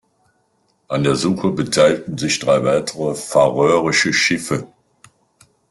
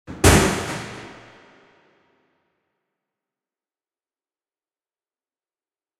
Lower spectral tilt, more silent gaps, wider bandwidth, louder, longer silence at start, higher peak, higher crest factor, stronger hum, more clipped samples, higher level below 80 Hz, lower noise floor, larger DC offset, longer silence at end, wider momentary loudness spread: about the same, -4 dB/octave vs -4 dB/octave; neither; second, 12.5 kHz vs 16 kHz; about the same, -17 LUFS vs -18 LUFS; first, 0.9 s vs 0.1 s; about the same, 0 dBFS vs 0 dBFS; second, 18 dB vs 26 dB; neither; neither; second, -54 dBFS vs -38 dBFS; second, -63 dBFS vs under -90 dBFS; neither; second, 1.05 s vs 4.85 s; second, 9 LU vs 24 LU